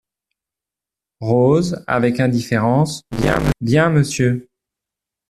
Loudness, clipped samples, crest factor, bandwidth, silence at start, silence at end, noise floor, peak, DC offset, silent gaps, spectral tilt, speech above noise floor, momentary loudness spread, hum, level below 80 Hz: -17 LUFS; under 0.1%; 16 dB; 14 kHz; 1.2 s; 0.9 s; -87 dBFS; -2 dBFS; under 0.1%; none; -6.5 dB/octave; 71 dB; 6 LU; none; -38 dBFS